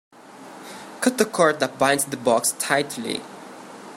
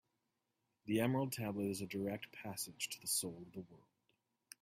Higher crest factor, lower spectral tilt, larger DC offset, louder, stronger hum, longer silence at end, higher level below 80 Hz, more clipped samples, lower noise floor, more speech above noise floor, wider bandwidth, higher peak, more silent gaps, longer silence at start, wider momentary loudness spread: about the same, 22 dB vs 20 dB; about the same, -3 dB/octave vs -4 dB/octave; neither; first, -22 LUFS vs -40 LUFS; neither; second, 0 s vs 0.85 s; first, -68 dBFS vs -78 dBFS; neither; second, -43 dBFS vs -87 dBFS; second, 21 dB vs 45 dB; about the same, 16 kHz vs 16 kHz; first, -2 dBFS vs -22 dBFS; neither; second, 0.25 s vs 0.85 s; first, 21 LU vs 17 LU